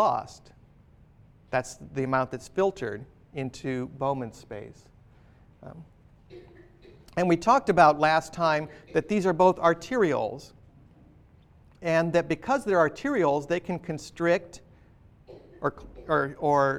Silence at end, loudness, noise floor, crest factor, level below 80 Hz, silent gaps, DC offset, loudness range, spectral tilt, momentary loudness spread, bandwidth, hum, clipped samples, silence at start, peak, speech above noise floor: 0 s; -26 LUFS; -56 dBFS; 22 dB; -56 dBFS; none; under 0.1%; 13 LU; -6 dB/octave; 19 LU; 13.5 kHz; none; under 0.1%; 0 s; -6 dBFS; 30 dB